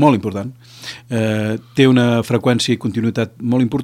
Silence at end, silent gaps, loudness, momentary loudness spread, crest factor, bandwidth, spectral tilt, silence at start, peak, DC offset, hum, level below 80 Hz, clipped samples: 0 s; none; -17 LUFS; 17 LU; 16 dB; 13.5 kHz; -6 dB/octave; 0 s; 0 dBFS; under 0.1%; none; -54 dBFS; under 0.1%